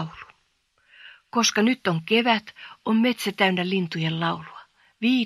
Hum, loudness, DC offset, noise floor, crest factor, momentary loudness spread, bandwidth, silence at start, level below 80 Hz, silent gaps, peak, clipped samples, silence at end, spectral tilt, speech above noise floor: none; -23 LUFS; under 0.1%; -68 dBFS; 22 dB; 14 LU; 14 kHz; 0 s; -68 dBFS; none; -4 dBFS; under 0.1%; 0 s; -4 dB/octave; 44 dB